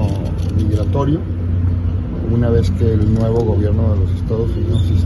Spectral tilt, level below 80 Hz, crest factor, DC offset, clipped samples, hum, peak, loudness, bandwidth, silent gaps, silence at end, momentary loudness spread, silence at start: -9.5 dB/octave; -24 dBFS; 14 dB; under 0.1%; under 0.1%; none; -2 dBFS; -17 LUFS; 10.5 kHz; none; 0 s; 5 LU; 0 s